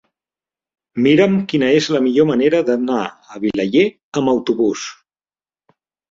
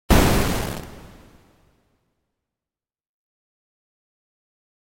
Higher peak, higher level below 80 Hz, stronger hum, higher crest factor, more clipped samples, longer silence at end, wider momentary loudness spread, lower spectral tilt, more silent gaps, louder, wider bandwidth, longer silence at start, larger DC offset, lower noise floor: about the same, -2 dBFS vs -2 dBFS; second, -58 dBFS vs -32 dBFS; neither; second, 16 dB vs 24 dB; neither; second, 1.15 s vs 3.95 s; second, 10 LU vs 24 LU; about the same, -6 dB/octave vs -5 dB/octave; first, 4.03-4.12 s vs none; first, -16 LUFS vs -21 LUFS; second, 7.8 kHz vs 16.5 kHz; first, 0.95 s vs 0.1 s; neither; about the same, under -90 dBFS vs under -90 dBFS